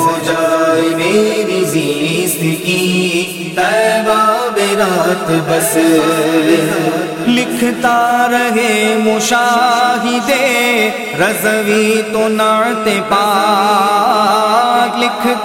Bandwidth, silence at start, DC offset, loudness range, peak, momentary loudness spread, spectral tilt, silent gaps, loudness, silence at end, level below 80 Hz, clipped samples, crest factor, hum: 17 kHz; 0 s; under 0.1%; 2 LU; 0 dBFS; 4 LU; -4 dB/octave; none; -12 LUFS; 0 s; -54 dBFS; under 0.1%; 12 dB; none